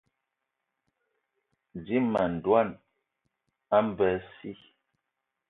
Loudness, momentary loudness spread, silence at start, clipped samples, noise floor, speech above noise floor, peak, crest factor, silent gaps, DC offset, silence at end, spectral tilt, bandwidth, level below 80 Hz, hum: -27 LUFS; 19 LU; 1.75 s; under 0.1%; -84 dBFS; 57 dB; -10 dBFS; 22 dB; none; under 0.1%; 0.95 s; -9 dB/octave; 5.4 kHz; -62 dBFS; none